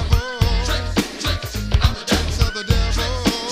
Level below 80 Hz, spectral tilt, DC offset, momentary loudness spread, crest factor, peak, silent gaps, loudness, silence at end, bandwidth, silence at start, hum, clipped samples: -22 dBFS; -4.5 dB/octave; under 0.1%; 4 LU; 18 dB; -2 dBFS; none; -20 LUFS; 0 s; 15.5 kHz; 0 s; none; under 0.1%